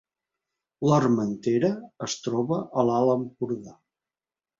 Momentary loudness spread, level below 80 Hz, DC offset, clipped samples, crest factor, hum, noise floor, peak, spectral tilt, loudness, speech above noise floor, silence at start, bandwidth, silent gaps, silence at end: 10 LU; -64 dBFS; under 0.1%; under 0.1%; 20 dB; none; under -90 dBFS; -8 dBFS; -6.5 dB/octave; -25 LUFS; over 65 dB; 0.8 s; 7.8 kHz; none; 0.85 s